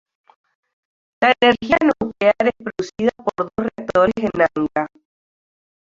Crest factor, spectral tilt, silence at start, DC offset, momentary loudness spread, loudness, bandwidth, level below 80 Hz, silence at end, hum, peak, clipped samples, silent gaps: 18 dB; -5.5 dB/octave; 1.2 s; under 0.1%; 10 LU; -18 LUFS; 7.6 kHz; -52 dBFS; 1.05 s; none; -2 dBFS; under 0.1%; none